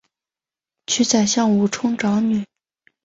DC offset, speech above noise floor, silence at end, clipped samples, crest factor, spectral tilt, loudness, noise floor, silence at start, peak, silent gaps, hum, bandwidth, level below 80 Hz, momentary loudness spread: under 0.1%; over 72 dB; 0.6 s; under 0.1%; 16 dB; -4 dB/octave; -19 LUFS; under -90 dBFS; 0.9 s; -4 dBFS; none; none; 8 kHz; -60 dBFS; 10 LU